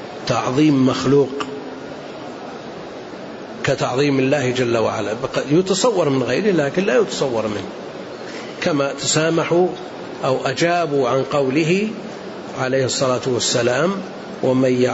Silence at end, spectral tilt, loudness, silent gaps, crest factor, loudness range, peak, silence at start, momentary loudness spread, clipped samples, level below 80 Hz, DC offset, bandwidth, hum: 0 s; -5 dB/octave; -18 LUFS; none; 16 dB; 3 LU; -4 dBFS; 0 s; 15 LU; under 0.1%; -56 dBFS; under 0.1%; 8 kHz; none